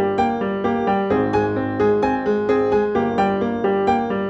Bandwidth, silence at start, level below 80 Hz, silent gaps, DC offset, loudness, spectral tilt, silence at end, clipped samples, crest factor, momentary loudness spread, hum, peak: 8 kHz; 0 s; -46 dBFS; none; under 0.1%; -19 LUFS; -8 dB/octave; 0 s; under 0.1%; 14 dB; 3 LU; none; -6 dBFS